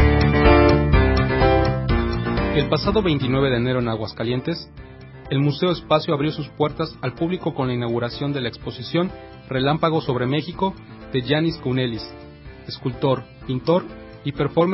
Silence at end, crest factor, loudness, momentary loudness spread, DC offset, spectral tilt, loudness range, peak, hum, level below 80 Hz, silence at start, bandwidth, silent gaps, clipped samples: 0 s; 16 dB; -21 LUFS; 14 LU; under 0.1%; -11 dB/octave; 6 LU; -4 dBFS; none; -30 dBFS; 0 s; 5.8 kHz; none; under 0.1%